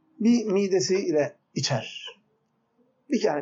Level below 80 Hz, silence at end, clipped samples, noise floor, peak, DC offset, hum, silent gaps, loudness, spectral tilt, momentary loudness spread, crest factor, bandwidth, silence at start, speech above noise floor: -78 dBFS; 0 s; under 0.1%; -71 dBFS; -12 dBFS; under 0.1%; none; none; -25 LUFS; -5 dB/octave; 12 LU; 14 dB; 8 kHz; 0.2 s; 47 dB